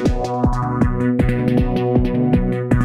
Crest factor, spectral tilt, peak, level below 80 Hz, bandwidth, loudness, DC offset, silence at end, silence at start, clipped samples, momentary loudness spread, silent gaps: 14 dB; -8.5 dB/octave; -2 dBFS; -26 dBFS; 11.5 kHz; -18 LUFS; under 0.1%; 0 s; 0 s; under 0.1%; 2 LU; none